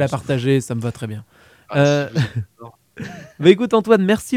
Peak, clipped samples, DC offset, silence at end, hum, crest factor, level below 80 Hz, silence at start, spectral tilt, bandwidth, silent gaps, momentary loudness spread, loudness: 0 dBFS; under 0.1%; under 0.1%; 0 s; none; 18 dB; -50 dBFS; 0 s; -6.5 dB/octave; 16 kHz; none; 19 LU; -18 LUFS